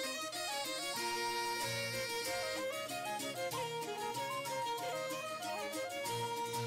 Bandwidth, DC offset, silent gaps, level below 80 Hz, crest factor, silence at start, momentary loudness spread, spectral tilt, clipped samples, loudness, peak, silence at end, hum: 16 kHz; under 0.1%; none; -74 dBFS; 10 dB; 0 s; 4 LU; -2 dB/octave; under 0.1%; -39 LUFS; -30 dBFS; 0 s; none